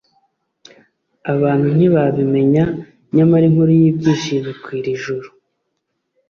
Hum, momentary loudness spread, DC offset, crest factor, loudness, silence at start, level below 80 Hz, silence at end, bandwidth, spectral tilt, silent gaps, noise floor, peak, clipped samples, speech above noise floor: none; 14 LU; under 0.1%; 14 dB; -15 LUFS; 1.25 s; -52 dBFS; 1 s; 6.8 kHz; -8 dB/octave; none; -72 dBFS; -2 dBFS; under 0.1%; 58 dB